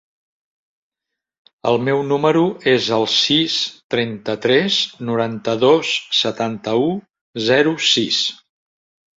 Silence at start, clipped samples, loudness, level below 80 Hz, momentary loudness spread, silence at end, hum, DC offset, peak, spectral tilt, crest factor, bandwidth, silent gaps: 1.65 s; under 0.1%; -17 LUFS; -62 dBFS; 8 LU; 0.85 s; none; under 0.1%; -2 dBFS; -4 dB/octave; 18 dB; 7.8 kHz; 3.84-3.90 s, 7.21-7.33 s